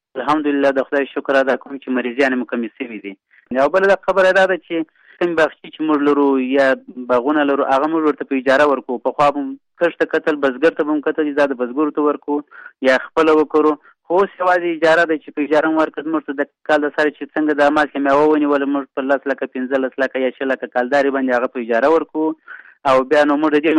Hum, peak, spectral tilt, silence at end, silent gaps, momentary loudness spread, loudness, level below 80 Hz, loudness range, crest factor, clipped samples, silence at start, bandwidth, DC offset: none; -4 dBFS; -5.5 dB/octave; 0 s; none; 9 LU; -17 LUFS; -58 dBFS; 2 LU; 14 dB; under 0.1%; 0.15 s; 10 kHz; under 0.1%